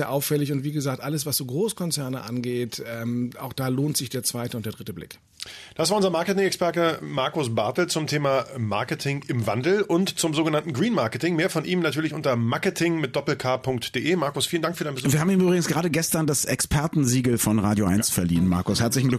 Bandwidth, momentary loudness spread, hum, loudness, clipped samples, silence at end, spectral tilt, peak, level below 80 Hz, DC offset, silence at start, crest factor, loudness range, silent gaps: 14 kHz; 8 LU; none; -24 LUFS; under 0.1%; 0 s; -4.5 dB/octave; -10 dBFS; -50 dBFS; under 0.1%; 0 s; 14 dB; 5 LU; none